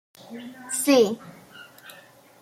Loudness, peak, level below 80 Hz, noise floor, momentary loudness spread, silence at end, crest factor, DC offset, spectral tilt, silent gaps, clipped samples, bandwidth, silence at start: -21 LUFS; -8 dBFS; -74 dBFS; -51 dBFS; 26 LU; 0.5 s; 18 dB; under 0.1%; -3 dB/octave; none; under 0.1%; 16.5 kHz; 0.3 s